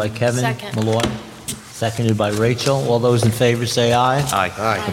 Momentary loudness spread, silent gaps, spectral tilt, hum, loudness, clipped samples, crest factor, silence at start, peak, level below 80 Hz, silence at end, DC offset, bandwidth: 8 LU; none; -5 dB/octave; none; -18 LUFS; under 0.1%; 16 dB; 0 s; -2 dBFS; -46 dBFS; 0 s; under 0.1%; 16.5 kHz